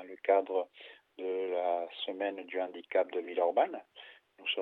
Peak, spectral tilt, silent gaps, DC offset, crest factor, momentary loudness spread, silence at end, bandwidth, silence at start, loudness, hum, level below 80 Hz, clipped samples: -14 dBFS; -5.5 dB/octave; none; under 0.1%; 20 dB; 21 LU; 0 s; 4.3 kHz; 0 s; -33 LUFS; none; under -90 dBFS; under 0.1%